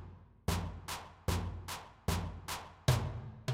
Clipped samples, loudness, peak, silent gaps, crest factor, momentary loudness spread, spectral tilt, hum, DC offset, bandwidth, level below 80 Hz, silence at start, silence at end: under 0.1%; -39 LUFS; -16 dBFS; none; 22 dB; 10 LU; -5 dB/octave; none; under 0.1%; 16.5 kHz; -48 dBFS; 0 s; 0 s